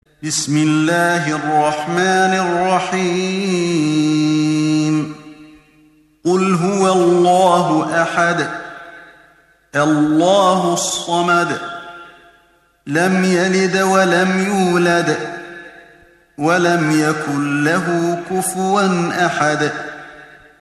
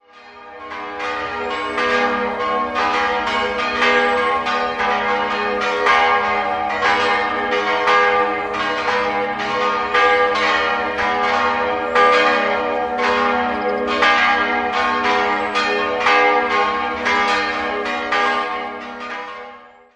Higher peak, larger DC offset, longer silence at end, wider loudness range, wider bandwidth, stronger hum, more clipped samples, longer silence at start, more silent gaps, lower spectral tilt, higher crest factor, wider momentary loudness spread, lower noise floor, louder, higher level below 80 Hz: about the same, 0 dBFS vs -2 dBFS; neither; about the same, 0.35 s vs 0.3 s; about the same, 2 LU vs 2 LU; first, 13.5 kHz vs 10.5 kHz; neither; neither; about the same, 0.2 s vs 0.15 s; neither; first, -5 dB/octave vs -3 dB/octave; about the same, 16 dB vs 16 dB; about the same, 11 LU vs 9 LU; first, -55 dBFS vs -41 dBFS; about the same, -16 LUFS vs -17 LUFS; second, -58 dBFS vs -48 dBFS